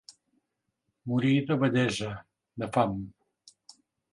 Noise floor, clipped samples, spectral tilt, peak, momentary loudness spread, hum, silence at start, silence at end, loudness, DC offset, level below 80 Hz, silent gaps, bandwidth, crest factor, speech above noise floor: -81 dBFS; under 0.1%; -6.5 dB/octave; -8 dBFS; 19 LU; none; 1.05 s; 1.05 s; -28 LUFS; under 0.1%; -62 dBFS; none; 11.5 kHz; 22 dB; 54 dB